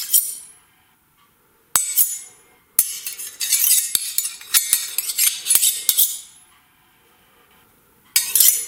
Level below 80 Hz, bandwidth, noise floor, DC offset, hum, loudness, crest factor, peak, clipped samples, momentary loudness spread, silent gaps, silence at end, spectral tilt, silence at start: -66 dBFS; 18 kHz; -58 dBFS; under 0.1%; none; -17 LUFS; 22 dB; 0 dBFS; under 0.1%; 13 LU; none; 0 s; 3.5 dB/octave; 0 s